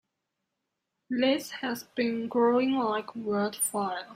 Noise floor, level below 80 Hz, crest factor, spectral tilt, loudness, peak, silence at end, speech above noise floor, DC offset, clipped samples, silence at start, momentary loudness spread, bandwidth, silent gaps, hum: -84 dBFS; -74 dBFS; 16 dB; -3.5 dB/octave; -28 LUFS; -12 dBFS; 0 s; 55 dB; under 0.1%; under 0.1%; 1.1 s; 9 LU; 16 kHz; none; none